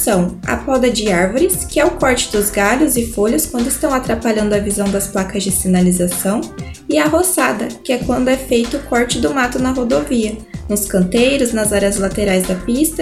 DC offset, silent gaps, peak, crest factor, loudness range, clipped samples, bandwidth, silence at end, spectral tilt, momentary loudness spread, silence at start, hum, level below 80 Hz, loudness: under 0.1%; none; -2 dBFS; 14 dB; 2 LU; under 0.1%; 15.5 kHz; 0 s; -4 dB/octave; 6 LU; 0 s; none; -34 dBFS; -15 LUFS